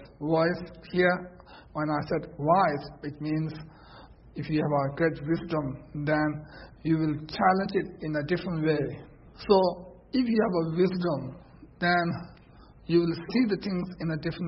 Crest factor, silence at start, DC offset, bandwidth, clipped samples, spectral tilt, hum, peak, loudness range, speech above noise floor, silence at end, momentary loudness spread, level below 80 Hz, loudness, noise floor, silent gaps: 18 dB; 0 s; under 0.1%; 5.8 kHz; under 0.1%; -11 dB/octave; none; -10 dBFS; 3 LU; 25 dB; 0 s; 15 LU; -54 dBFS; -28 LUFS; -52 dBFS; none